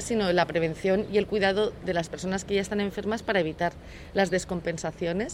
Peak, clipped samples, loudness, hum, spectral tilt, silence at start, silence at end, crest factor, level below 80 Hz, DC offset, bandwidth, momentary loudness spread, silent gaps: -8 dBFS; under 0.1%; -27 LUFS; none; -5 dB/octave; 0 s; 0 s; 18 dB; -48 dBFS; under 0.1%; 15.5 kHz; 7 LU; none